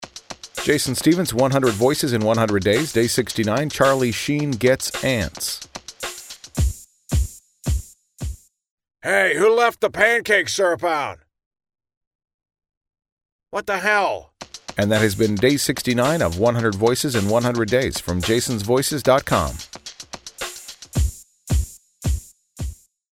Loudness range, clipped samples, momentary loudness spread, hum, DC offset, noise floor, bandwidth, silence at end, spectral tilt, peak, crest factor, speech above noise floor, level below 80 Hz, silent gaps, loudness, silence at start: 8 LU; under 0.1%; 16 LU; none; under 0.1%; -39 dBFS; 17 kHz; 0.4 s; -4.5 dB/octave; -2 dBFS; 20 dB; 20 dB; -34 dBFS; 8.71-8.78 s, 11.46-11.51 s, 11.97-12.01 s, 12.07-12.19 s, 12.34-12.39 s, 12.77-12.81 s, 13.12-13.17 s, 13.32-13.39 s; -20 LUFS; 0 s